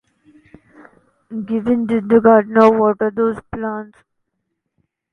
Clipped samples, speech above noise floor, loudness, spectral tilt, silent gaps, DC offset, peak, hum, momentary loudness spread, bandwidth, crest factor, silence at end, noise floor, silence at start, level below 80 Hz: under 0.1%; 59 dB; -15 LUFS; -8.5 dB/octave; none; under 0.1%; 0 dBFS; none; 16 LU; 6 kHz; 18 dB; 1.3 s; -74 dBFS; 1.3 s; -54 dBFS